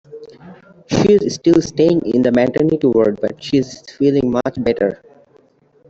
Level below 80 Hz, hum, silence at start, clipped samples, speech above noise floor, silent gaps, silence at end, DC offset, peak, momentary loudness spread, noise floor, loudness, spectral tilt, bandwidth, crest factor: -48 dBFS; none; 0.1 s; under 0.1%; 38 dB; none; 0.95 s; under 0.1%; -2 dBFS; 7 LU; -53 dBFS; -16 LUFS; -6.5 dB/octave; 8 kHz; 14 dB